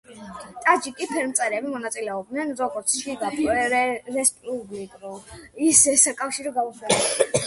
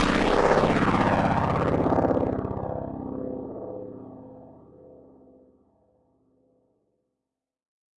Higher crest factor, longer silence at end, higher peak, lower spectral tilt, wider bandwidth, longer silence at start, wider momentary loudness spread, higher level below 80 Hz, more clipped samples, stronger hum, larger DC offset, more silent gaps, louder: about the same, 24 dB vs 20 dB; second, 0 s vs 3.05 s; first, 0 dBFS vs -8 dBFS; second, -2 dB/octave vs -6.5 dB/octave; about the same, 12 kHz vs 11.5 kHz; about the same, 0.1 s vs 0 s; about the same, 21 LU vs 20 LU; second, -58 dBFS vs -44 dBFS; neither; neither; neither; neither; about the same, -22 LUFS vs -24 LUFS